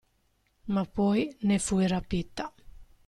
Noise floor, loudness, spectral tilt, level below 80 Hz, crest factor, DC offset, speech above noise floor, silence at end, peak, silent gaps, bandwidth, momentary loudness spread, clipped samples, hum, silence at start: -71 dBFS; -29 LUFS; -5.5 dB/octave; -48 dBFS; 14 dB; under 0.1%; 43 dB; 0.25 s; -16 dBFS; none; 12 kHz; 13 LU; under 0.1%; none; 0.65 s